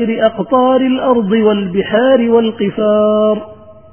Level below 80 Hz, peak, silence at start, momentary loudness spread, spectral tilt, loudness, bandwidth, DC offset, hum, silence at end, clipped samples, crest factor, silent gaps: -50 dBFS; 0 dBFS; 0 s; 5 LU; -10.5 dB/octave; -12 LUFS; 3.3 kHz; 0.4%; none; 0.2 s; under 0.1%; 12 dB; none